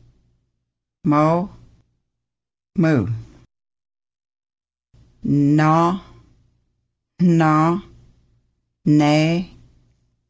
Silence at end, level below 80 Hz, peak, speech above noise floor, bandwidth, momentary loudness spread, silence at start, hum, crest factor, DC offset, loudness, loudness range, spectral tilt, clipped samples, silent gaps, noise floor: 0.85 s; -52 dBFS; -4 dBFS; 70 dB; 8 kHz; 14 LU; 1.05 s; none; 16 dB; under 0.1%; -18 LUFS; 7 LU; -7.5 dB/octave; under 0.1%; none; -86 dBFS